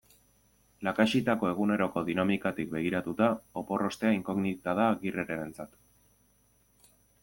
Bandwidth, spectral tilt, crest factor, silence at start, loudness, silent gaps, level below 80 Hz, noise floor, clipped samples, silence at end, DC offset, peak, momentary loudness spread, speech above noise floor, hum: 17 kHz; -6.5 dB/octave; 20 dB; 0.8 s; -30 LUFS; none; -66 dBFS; -67 dBFS; under 0.1%; 1.55 s; under 0.1%; -10 dBFS; 9 LU; 38 dB; none